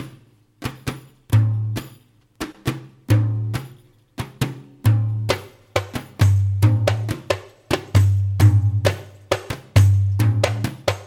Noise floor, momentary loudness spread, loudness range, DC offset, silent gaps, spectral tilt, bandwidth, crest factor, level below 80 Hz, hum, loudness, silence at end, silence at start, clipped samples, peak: -51 dBFS; 16 LU; 6 LU; under 0.1%; none; -6.5 dB/octave; 15.5 kHz; 20 dB; -44 dBFS; none; -21 LUFS; 0 s; 0 s; under 0.1%; 0 dBFS